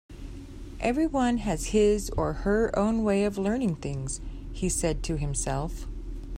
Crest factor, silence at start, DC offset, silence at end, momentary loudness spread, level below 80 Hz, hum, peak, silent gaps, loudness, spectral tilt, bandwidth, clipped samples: 16 dB; 0.1 s; under 0.1%; 0 s; 16 LU; -38 dBFS; none; -12 dBFS; none; -27 LUFS; -5.5 dB/octave; 16 kHz; under 0.1%